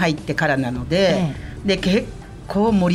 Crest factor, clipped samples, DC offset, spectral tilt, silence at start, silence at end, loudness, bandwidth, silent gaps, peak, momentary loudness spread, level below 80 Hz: 14 dB; under 0.1%; under 0.1%; -6 dB/octave; 0 s; 0 s; -20 LUFS; 12.5 kHz; none; -6 dBFS; 9 LU; -38 dBFS